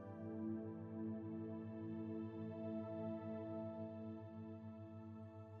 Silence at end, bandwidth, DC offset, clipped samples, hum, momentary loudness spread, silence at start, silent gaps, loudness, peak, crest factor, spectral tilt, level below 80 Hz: 0 s; 4.6 kHz; under 0.1%; under 0.1%; none; 8 LU; 0 s; none; -49 LUFS; -36 dBFS; 14 dB; -9.5 dB/octave; under -90 dBFS